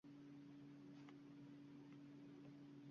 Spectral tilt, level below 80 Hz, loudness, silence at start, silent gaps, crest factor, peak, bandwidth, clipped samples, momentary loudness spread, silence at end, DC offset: -7 dB/octave; under -90 dBFS; -61 LUFS; 0.05 s; none; 16 dB; -46 dBFS; 7 kHz; under 0.1%; 0 LU; 0 s; under 0.1%